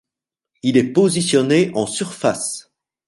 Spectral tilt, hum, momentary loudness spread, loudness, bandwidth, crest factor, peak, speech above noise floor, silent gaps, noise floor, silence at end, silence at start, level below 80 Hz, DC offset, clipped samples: -4.5 dB/octave; none; 9 LU; -18 LUFS; 11.5 kHz; 18 dB; -2 dBFS; 69 dB; none; -86 dBFS; 0.5 s; 0.65 s; -60 dBFS; under 0.1%; under 0.1%